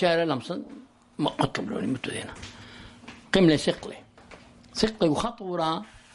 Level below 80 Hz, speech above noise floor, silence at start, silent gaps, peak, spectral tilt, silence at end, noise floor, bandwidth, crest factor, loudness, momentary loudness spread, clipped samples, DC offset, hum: -52 dBFS; 24 dB; 0 s; none; -6 dBFS; -5.5 dB/octave; 0.15 s; -50 dBFS; 11.5 kHz; 20 dB; -27 LUFS; 23 LU; under 0.1%; under 0.1%; none